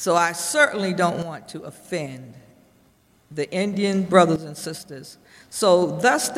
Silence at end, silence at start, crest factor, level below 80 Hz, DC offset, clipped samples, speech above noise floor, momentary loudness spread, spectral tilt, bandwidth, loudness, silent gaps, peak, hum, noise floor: 0 s; 0 s; 20 dB; -62 dBFS; under 0.1%; under 0.1%; 37 dB; 19 LU; -4 dB/octave; 16 kHz; -21 LUFS; none; -2 dBFS; none; -59 dBFS